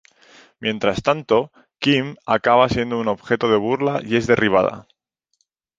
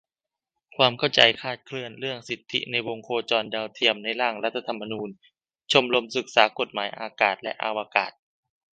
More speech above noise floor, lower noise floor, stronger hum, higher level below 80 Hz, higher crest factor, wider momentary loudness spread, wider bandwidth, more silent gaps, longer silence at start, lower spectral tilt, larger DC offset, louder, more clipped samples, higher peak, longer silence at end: second, 51 dB vs 64 dB; second, -70 dBFS vs -90 dBFS; neither; first, -50 dBFS vs -72 dBFS; second, 18 dB vs 26 dB; second, 8 LU vs 13 LU; second, 7.8 kHz vs 9.2 kHz; neither; second, 0.6 s vs 0.8 s; first, -6 dB/octave vs -3.5 dB/octave; neither; first, -19 LUFS vs -24 LUFS; neither; about the same, -2 dBFS vs 0 dBFS; first, 0.95 s vs 0.65 s